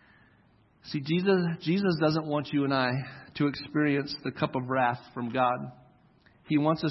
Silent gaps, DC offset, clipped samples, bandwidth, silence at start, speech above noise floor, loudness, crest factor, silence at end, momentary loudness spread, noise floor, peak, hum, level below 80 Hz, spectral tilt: none; under 0.1%; under 0.1%; 6 kHz; 0.85 s; 35 dB; -28 LUFS; 18 dB; 0 s; 10 LU; -63 dBFS; -12 dBFS; none; -66 dBFS; -8.5 dB/octave